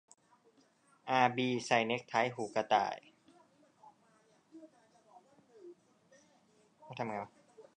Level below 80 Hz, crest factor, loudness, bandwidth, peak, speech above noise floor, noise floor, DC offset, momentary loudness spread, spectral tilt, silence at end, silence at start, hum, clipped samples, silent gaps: -84 dBFS; 26 dB; -34 LUFS; 10 kHz; -12 dBFS; 36 dB; -69 dBFS; under 0.1%; 26 LU; -4.5 dB/octave; 0.15 s; 1.05 s; none; under 0.1%; none